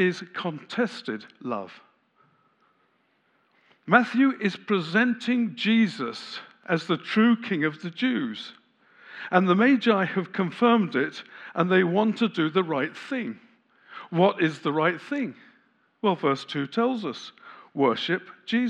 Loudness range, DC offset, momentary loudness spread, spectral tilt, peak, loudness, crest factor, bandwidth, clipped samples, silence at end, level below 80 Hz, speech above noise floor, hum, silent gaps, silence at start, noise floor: 5 LU; under 0.1%; 15 LU; -6.5 dB/octave; -2 dBFS; -25 LUFS; 24 dB; 9.2 kHz; under 0.1%; 0 s; -88 dBFS; 43 dB; none; none; 0 s; -68 dBFS